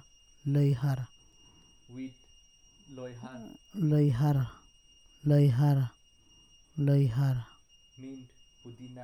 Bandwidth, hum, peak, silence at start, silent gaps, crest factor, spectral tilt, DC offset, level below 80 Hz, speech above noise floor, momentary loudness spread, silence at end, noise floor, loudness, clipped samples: 12.5 kHz; none; -14 dBFS; 0.45 s; none; 18 dB; -9 dB/octave; under 0.1%; -60 dBFS; 33 dB; 23 LU; 0 s; -61 dBFS; -28 LUFS; under 0.1%